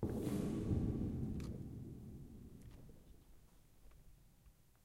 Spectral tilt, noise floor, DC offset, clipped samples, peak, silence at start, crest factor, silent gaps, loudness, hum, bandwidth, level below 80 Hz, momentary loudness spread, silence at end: -8.5 dB/octave; -67 dBFS; under 0.1%; under 0.1%; -26 dBFS; 0 s; 18 dB; none; -43 LUFS; none; 16 kHz; -54 dBFS; 22 LU; 0.2 s